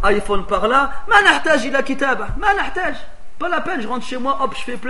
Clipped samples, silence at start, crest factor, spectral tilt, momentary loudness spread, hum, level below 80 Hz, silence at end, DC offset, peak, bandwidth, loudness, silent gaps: under 0.1%; 0 s; 18 dB; -3.5 dB/octave; 11 LU; none; -32 dBFS; 0 s; 6%; 0 dBFS; 11.5 kHz; -18 LUFS; none